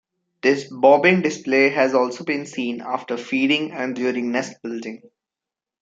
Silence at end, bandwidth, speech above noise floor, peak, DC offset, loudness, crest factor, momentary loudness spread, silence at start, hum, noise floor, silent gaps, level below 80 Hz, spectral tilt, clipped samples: 0.85 s; 7.8 kHz; 68 dB; -2 dBFS; under 0.1%; -20 LUFS; 18 dB; 13 LU; 0.45 s; none; -88 dBFS; none; -72 dBFS; -5 dB/octave; under 0.1%